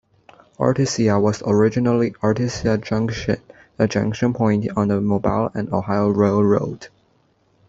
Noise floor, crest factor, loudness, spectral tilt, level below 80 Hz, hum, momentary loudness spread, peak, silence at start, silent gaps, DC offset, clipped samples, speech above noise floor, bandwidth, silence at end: -61 dBFS; 18 dB; -20 LUFS; -7 dB/octave; -48 dBFS; none; 6 LU; -2 dBFS; 0.6 s; none; under 0.1%; under 0.1%; 42 dB; 7.8 kHz; 0.8 s